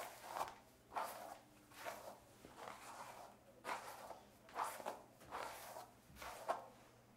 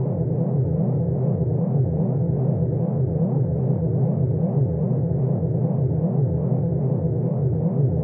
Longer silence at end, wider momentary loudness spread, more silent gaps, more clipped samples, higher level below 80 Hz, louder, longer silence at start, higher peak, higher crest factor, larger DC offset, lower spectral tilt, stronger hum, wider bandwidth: about the same, 0 s vs 0 s; first, 14 LU vs 1 LU; neither; neither; second, -78 dBFS vs -46 dBFS; second, -51 LUFS vs -22 LUFS; about the same, 0 s vs 0 s; second, -28 dBFS vs -10 dBFS; first, 24 dB vs 12 dB; neither; second, -2.5 dB/octave vs -16 dB/octave; neither; first, 16 kHz vs 2 kHz